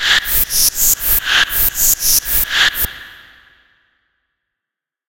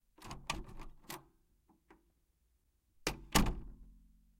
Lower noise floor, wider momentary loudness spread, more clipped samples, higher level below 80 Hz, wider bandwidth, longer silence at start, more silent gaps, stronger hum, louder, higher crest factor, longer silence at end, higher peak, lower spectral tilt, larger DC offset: first, -84 dBFS vs -76 dBFS; second, 4 LU vs 21 LU; neither; first, -32 dBFS vs -46 dBFS; about the same, 17.5 kHz vs 16.5 kHz; second, 0 s vs 0.2 s; neither; neither; first, -12 LUFS vs -39 LUFS; second, 16 dB vs 30 dB; first, 1.95 s vs 0.4 s; first, 0 dBFS vs -12 dBFS; second, 1.5 dB/octave vs -3.5 dB/octave; neither